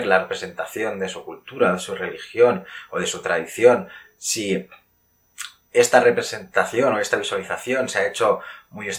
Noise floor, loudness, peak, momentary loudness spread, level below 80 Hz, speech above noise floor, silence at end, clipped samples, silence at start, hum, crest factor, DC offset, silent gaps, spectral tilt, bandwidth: -63 dBFS; -21 LUFS; 0 dBFS; 14 LU; -66 dBFS; 42 dB; 0 s; under 0.1%; 0 s; none; 22 dB; under 0.1%; none; -3 dB/octave; 16 kHz